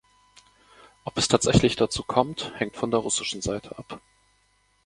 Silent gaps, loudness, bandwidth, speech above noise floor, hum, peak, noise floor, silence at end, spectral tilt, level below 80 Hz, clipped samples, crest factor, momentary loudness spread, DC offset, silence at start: none; -25 LUFS; 11.5 kHz; 41 dB; 50 Hz at -50 dBFS; -2 dBFS; -66 dBFS; 0.9 s; -4 dB/octave; -46 dBFS; under 0.1%; 26 dB; 20 LU; under 0.1%; 1.05 s